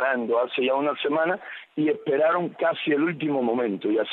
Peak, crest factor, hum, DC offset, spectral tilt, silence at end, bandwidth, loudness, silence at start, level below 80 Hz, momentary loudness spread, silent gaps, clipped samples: -12 dBFS; 12 dB; none; under 0.1%; -8.5 dB/octave; 0 s; 4.2 kHz; -24 LUFS; 0 s; -80 dBFS; 4 LU; none; under 0.1%